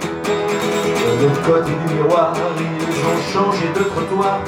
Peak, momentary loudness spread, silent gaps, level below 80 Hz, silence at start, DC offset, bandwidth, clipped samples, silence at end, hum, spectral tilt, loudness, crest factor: -2 dBFS; 5 LU; none; -52 dBFS; 0 s; under 0.1%; over 20 kHz; under 0.1%; 0 s; none; -5.5 dB/octave; -17 LUFS; 16 dB